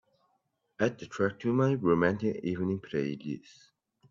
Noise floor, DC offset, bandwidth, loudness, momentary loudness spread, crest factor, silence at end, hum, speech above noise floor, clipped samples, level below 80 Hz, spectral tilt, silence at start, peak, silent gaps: -77 dBFS; under 0.1%; 7.6 kHz; -30 LUFS; 10 LU; 20 dB; 0.7 s; none; 47 dB; under 0.1%; -66 dBFS; -7.5 dB/octave; 0.8 s; -12 dBFS; none